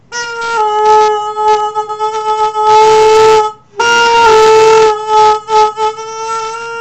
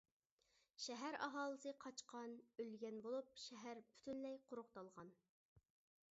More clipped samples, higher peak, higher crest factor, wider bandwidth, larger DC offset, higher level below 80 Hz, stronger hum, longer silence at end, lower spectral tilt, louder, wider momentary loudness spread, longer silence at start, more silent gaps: first, 0.5% vs under 0.1%; first, 0 dBFS vs -32 dBFS; second, 10 dB vs 22 dB; first, 10 kHz vs 7.6 kHz; first, 0.5% vs under 0.1%; first, -44 dBFS vs under -90 dBFS; neither; second, 0 s vs 0.5 s; about the same, -2 dB/octave vs -2 dB/octave; first, -9 LUFS vs -52 LUFS; about the same, 12 LU vs 11 LU; second, 0.1 s vs 0.8 s; second, none vs 5.29-5.56 s